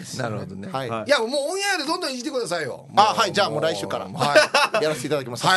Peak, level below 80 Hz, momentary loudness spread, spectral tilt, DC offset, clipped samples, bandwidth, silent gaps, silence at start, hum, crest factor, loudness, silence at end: -2 dBFS; -66 dBFS; 11 LU; -3 dB/octave; under 0.1%; under 0.1%; 12 kHz; none; 0 s; none; 20 dB; -22 LUFS; 0 s